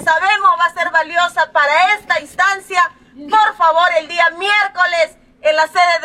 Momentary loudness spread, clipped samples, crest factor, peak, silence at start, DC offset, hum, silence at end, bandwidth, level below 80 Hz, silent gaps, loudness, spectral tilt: 5 LU; under 0.1%; 12 dB; -2 dBFS; 0 s; under 0.1%; none; 0 s; 14.5 kHz; -58 dBFS; none; -14 LUFS; -0.5 dB/octave